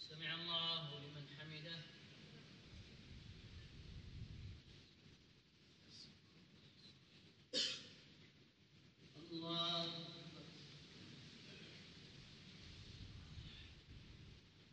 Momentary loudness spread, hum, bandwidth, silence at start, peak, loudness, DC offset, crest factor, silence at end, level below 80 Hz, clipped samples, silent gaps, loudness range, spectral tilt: 25 LU; none; 9 kHz; 0 s; -28 dBFS; -48 LUFS; under 0.1%; 24 dB; 0 s; -68 dBFS; under 0.1%; none; 14 LU; -3.5 dB/octave